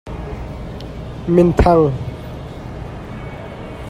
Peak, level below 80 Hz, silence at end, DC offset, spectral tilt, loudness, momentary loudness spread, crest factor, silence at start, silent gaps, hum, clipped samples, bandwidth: 0 dBFS; -30 dBFS; 0 s; under 0.1%; -8.5 dB/octave; -16 LUFS; 18 LU; 18 dB; 0.05 s; none; none; under 0.1%; 11 kHz